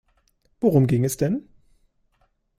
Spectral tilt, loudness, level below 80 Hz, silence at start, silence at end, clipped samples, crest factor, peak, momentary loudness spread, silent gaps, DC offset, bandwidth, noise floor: -7.5 dB/octave; -22 LUFS; -54 dBFS; 0.6 s; 1.2 s; under 0.1%; 18 dB; -6 dBFS; 7 LU; none; under 0.1%; 15.5 kHz; -67 dBFS